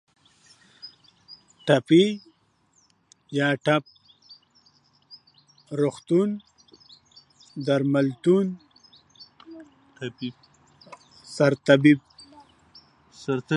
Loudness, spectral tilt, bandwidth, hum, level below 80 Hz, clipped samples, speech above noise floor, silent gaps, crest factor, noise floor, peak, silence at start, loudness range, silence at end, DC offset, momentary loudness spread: -23 LUFS; -6.5 dB/octave; 11 kHz; none; -72 dBFS; under 0.1%; 44 dB; none; 24 dB; -65 dBFS; -2 dBFS; 0.85 s; 6 LU; 0 s; under 0.1%; 26 LU